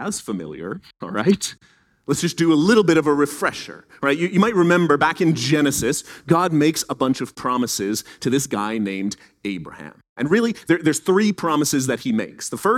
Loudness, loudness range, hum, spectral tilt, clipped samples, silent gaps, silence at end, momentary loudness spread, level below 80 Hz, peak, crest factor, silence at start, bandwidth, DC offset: -20 LUFS; 5 LU; none; -4.5 dB/octave; under 0.1%; 10.09-10.16 s; 0 s; 14 LU; -56 dBFS; -2 dBFS; 18 dB; 0 s; 16.5 kHz; under 0.1%